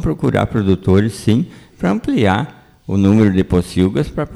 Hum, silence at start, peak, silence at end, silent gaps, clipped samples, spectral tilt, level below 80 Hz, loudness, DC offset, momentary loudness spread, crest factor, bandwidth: none; 0 s; -2 dBFS; 0 s; none; under 0.1%; -7.5 dB/octave; -36 dBFS; -16 LUFS; under 0.1%; 9 LU; 14 dB; 13 kHz